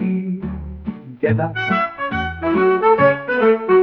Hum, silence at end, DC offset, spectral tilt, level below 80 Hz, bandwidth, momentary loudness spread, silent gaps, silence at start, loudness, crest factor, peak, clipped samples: none; 0 s; under 0.1%; -9 dB/octave; -42 dBFS; 5.8 kHz; 15 LU; none; 0 s; -17 LUFS; 14 dB; -4 dBFS; under 0.1%